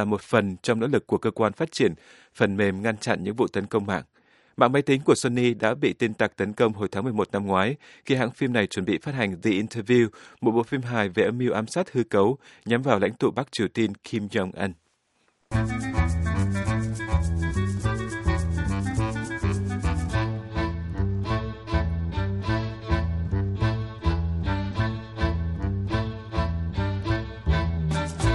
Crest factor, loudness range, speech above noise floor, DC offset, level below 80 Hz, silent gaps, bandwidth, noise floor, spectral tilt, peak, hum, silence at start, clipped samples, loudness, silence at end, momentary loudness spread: 24 dB; 4 LU; 44 dB; under 0.1%; -38 dBFS; none; 11.5 kHz; -69 dBFS; -6.5 dB/octave; -2 dBFS; none; 0 s; under 0.1%; -26 LUFS; 0 s; 6 LU